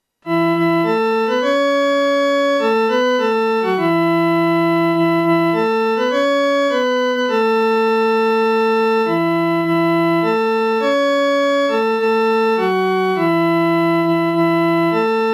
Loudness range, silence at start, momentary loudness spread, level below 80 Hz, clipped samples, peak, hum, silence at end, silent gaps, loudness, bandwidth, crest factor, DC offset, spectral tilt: 0 LU; 0.25 s; 1 LU; -66 dBFS; under 0.1%; -6 dBFS; none; 0 s; none; -16 LUFS; 16.5 kHz; 10 dB; under 0.1%; -6 dB/octave